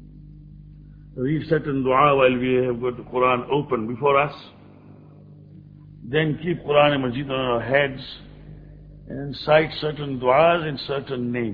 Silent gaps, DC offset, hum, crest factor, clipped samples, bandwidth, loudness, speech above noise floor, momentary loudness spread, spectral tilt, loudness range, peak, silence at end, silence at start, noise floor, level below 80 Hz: none; under 0.1%; 50 Hz at -45 dBFS; 20 dB; under 0.1%; 5.4 kHz; -21 LUFS; 25 dB; 14 LU; -9 dB/octave; 4 LU; -2 dBFS; 0 s; 0 s; -46 dBFS; -50 dBFS